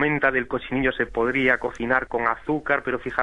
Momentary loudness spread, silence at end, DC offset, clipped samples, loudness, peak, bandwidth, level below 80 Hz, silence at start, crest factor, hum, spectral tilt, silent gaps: 5 LU; 0 s; under 0.1%; under 0.1%; -23 LUFS; -4 dBFS; 10.5 kHz; -46 dBFS; 0 s; 18 dB; none; -7 dB/octave; none